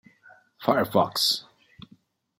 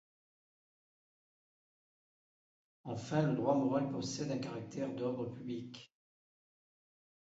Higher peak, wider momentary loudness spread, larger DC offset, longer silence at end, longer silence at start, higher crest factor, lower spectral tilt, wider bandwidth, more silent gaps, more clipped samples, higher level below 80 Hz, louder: first, -4 dBFS vs -18 dBFS; second, 8 LU vs 13 LU; neither; second, 1 s vs 1.5 s; second, 0.6 s vs 2.85 s; about the same, 24 dB vs 22 dB; second, -3.5 dB/octave vs -6.5 dB/octave; first, 16.5 kHz vs 8 kHz; neither; neither; first, -68 dBFS vs -76 dBFS; first, -24 LUFS vs -37 LUFS